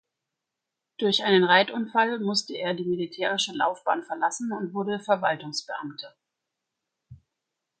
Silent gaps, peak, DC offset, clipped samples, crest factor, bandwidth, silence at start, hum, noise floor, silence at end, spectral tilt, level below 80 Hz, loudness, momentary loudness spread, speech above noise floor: none; -4 dBFS; under 0.1%; under 0.1%; 22 dB; 9.2 kHz; 1 s; none; -86 dBFS; 0.65 s; -3.5 dB/octave; -72 dBFS; -25 LUFS; 12 LU; 60 dB